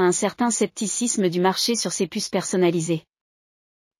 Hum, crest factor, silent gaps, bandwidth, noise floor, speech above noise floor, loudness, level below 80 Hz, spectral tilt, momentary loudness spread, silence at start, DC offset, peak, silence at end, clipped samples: none; 16 dB; none; 16 kHz; under -90 dBFS; over 67 dB; -22 LUFS; -68 dBFS; -4 dB/octave; 5 LU; 0 s; under 0.1%; -8 dBFS; 1 s; under 0.1%